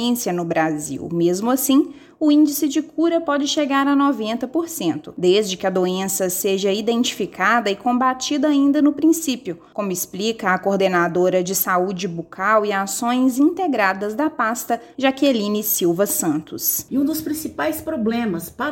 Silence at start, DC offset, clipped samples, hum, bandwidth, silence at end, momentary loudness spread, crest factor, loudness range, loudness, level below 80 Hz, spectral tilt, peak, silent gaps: 0 s; under 0.1%; under 0.1%; none; 17 kHz; 0 s; 7 LU; 16 dB; 2 LU; -19 LUFS; -60 dBFS; -4 dB/octave; -4 dBFS; none